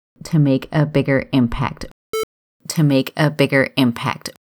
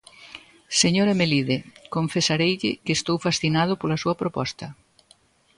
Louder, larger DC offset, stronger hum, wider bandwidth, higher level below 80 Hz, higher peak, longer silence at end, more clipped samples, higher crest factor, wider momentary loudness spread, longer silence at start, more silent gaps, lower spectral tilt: first, -18 LUFS vs -23 LUFS; neither; neither; first, over 20 kHz vs 11.5 kHz; first, -40 dBFS vs -56 dBFS; first, -2 dBFS vs -6 dBFS; second, 0.2 s vs 0.85 s; neither; about the same, 16 dB vs 18 dB; second, 10 LU vs 19 LU; about the same, 0.25 s vs 0.2 s; first, 1.91-2.13 s, 2.23-2.60 s vs none; first, -6 dB/octave vs -4 dB/octave